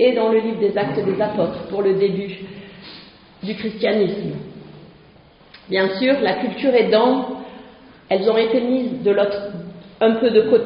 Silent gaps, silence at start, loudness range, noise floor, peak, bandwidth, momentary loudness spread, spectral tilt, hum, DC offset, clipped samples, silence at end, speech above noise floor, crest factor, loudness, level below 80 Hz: none; 0 s; 6 LU; -48 dBFS; -2 dBFS; 5.4 kHz; 21 LU; -4 dB/octave; none; under 0.1%; under 0.1%; 0 s; 30 dB; 18 dB; -19 LUFS; -58 dBFS